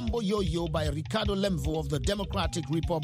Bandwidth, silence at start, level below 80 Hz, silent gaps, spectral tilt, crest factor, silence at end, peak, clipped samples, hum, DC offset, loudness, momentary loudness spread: 16 kHz; 0 s; -38 dBFS; none; -6 dB/octave; 18 dB; 0 s; -12 dBFS; under 0.1%; none; under 0.1%; -30 LUFS; 2 LU